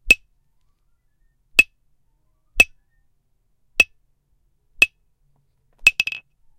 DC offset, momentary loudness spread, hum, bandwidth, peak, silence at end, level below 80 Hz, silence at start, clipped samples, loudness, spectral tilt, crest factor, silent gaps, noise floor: under 0.1%; 9 LU; none; 16 kHz; 0 dBFS; 0.4 s; -44 dBFS; 0.05 s; under 0.1%; -18 LUFS; 0 dB/octave; 24 dB; none; -65 dBFS